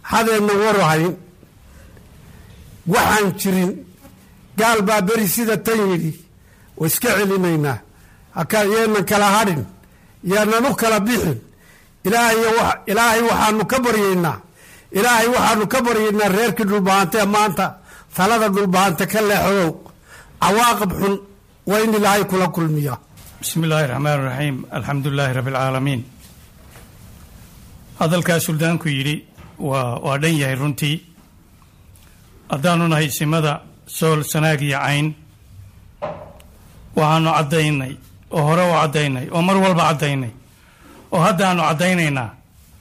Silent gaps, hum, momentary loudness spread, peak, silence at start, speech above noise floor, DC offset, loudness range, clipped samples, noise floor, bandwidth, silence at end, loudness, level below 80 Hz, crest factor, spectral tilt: none; none; 12 LU; -2 dBFS; 0.05 s; 31 dB; under 0.1%; 5 LU; under 0.1%; -48 dBFS; 16 kHz; 0.5 s; -18 LUFS; -50 dBFS; 16 dB; -5 dB/octave